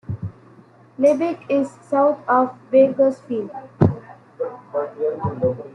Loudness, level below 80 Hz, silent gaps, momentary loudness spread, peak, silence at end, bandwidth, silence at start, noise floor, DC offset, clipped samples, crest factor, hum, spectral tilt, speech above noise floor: -20 LUFS; -56 dBFS; none; 14 LU; -2 dBFS; 0.05 s; 9.8 kHz; 0.1 s; -49 dBFS; under 0.1%; under 0.1%; 18 dB; none; -9 dB/octave; 29 dB